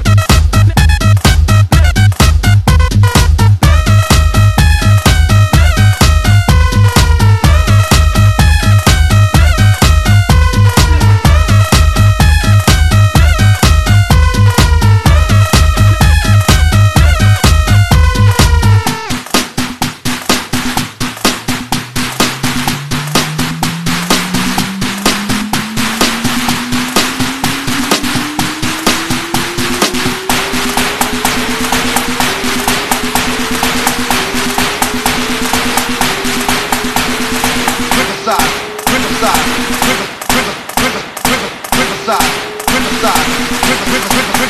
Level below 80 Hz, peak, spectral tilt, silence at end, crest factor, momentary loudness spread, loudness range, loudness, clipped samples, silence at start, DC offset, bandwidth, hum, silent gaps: -16 dBFS; 0 dBFS; -4.5 dB/octave; 0 s; 10 dB; 6 LU; 5 LU; -10 LUFS; 0.6%; 0 s; 3%; 14 kHz; none; none